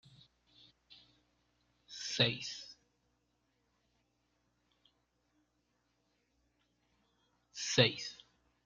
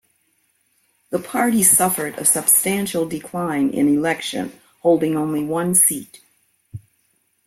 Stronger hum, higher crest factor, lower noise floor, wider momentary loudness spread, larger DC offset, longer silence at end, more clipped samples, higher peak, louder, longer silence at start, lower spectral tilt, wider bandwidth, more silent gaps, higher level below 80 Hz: first, 60 Hz at -70 dBFS vs none; first, 30 dB vs 20 dB; first, -80 dBFS vs -65 dBFS; first, 22 LU vs 13 LU; neither; second, 0.5 s vs 0.7 s; neither; second, -12 dBFS vs 0 dBFS; second, -34 LUFS vs -17 LUFS; second, 0.9 s vs 1.1 s; about the same, -3.5 dB/octave vs -3.5 dB/octave; second, 9.4 kHz vs 16.5 kHz; neither; second, -76 dBFS vs -60 dBFS